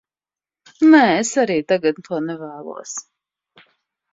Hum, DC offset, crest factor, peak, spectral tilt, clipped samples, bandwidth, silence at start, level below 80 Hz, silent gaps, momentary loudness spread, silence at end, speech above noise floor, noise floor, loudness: none; under 0.1%; 18 dB; -2 dBFS; -4 dB/octave; under 0.1%; 7.8 kHz; 0.8 s; -66 dBFS; none; 19 LU; 1.1 s; over 73 dB; under -90 dBFS; -17 LUFS